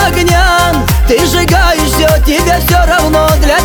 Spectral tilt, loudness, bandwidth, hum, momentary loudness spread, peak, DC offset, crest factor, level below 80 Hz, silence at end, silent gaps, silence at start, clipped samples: -4.5 dB/octave; -9 LUFS; over 20 kHz; none; 2 LU; 0 dBFS; under 0.1%; 8 dB; -14 dBFS; 0 s; none; 0 s; under 0.1%